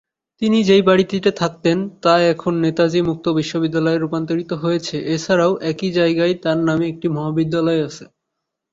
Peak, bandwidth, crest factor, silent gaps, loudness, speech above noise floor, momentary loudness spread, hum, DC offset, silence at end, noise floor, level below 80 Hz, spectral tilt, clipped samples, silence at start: -2 dBFS; 7.8 kHz; 16 dB; none; -18 LUFS; 61 dB; 7 LU; none; under 0.1%; 0.7 s; -79 dBFS; -56 dBFS; -6 dB/octave; under 0.1%; 0.4 s